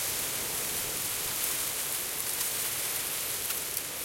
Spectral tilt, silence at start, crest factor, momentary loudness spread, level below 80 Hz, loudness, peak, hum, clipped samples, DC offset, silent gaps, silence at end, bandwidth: 0 dB/octave; 0 s; 20 dB; 2 LU; -60 dBFS; -30 LUFS; -14 dBFS; none; under 0.1%; under 0.1%; none; 0 s; 16.5 kHz